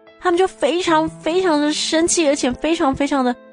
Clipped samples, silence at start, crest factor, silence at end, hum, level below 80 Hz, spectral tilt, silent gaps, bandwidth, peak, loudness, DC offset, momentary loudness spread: under 0.1%; 0.2 s; 14 dB; 0.2 s; none; -46 dBFS; -3 dB/octave; none; 10.5 kHz; -4 dBFS; -18 LUFS; under 0.1%; 4 LU